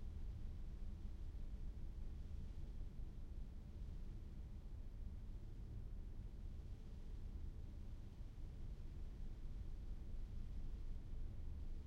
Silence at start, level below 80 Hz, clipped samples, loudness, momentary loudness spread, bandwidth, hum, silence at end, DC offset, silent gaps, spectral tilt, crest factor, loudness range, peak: 0 s; -50 dBFS; under 0.1%; -55 LUFS; 3 LU; 6.6 kHz; none; 0 s; under 0.1%; none; -8 dB/octave; 10 dB; 1 LU; -38 dBFS